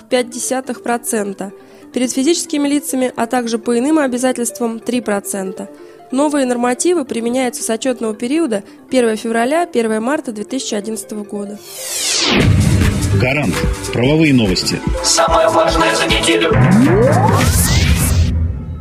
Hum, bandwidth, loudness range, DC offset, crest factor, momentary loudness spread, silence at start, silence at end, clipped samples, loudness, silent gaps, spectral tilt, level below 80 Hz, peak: none; 15.5 kHz; 6 LU; under 0.1%; 14 dB; 11 LU; 0.1 s; 0 s; under 0.1%; -15 LUFS; none; -4.5 dB/octave; -28 dBFS; 0 dBFS